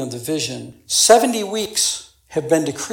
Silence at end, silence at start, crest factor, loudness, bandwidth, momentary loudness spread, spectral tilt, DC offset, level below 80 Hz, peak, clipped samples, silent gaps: 0 s; 0 s; 20 dB; -18 LUFS; 18 kHz; 15 LU; -2.5 dB/octave; under 0.1%; -58 dBFS; 0 dBFS; under 0.1%; none